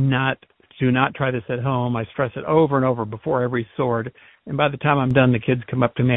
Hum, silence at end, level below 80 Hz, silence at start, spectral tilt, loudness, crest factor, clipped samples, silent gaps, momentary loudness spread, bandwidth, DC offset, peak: none; 0 s; -52 dBFS; 0 s; -10.5 dB/octave; -21 LUFS; 20 dB; under 0.1%; none; 8 LU; 3.9 kHz; under 0.1%; 0 dBFS